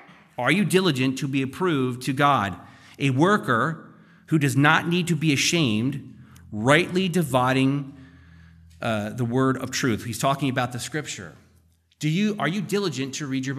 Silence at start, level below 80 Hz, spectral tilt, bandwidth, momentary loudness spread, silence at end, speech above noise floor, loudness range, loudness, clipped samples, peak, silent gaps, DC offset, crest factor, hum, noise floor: 0.4 s; -62 dBFS; -5 dB/octave; 15 kHz; 11 LU; 0 s; 38 dB; 5 LU; -23 LUFS; under 0.1%; -2 dBFS; none; under 0.1%; 22 dB; none; -60 dBFS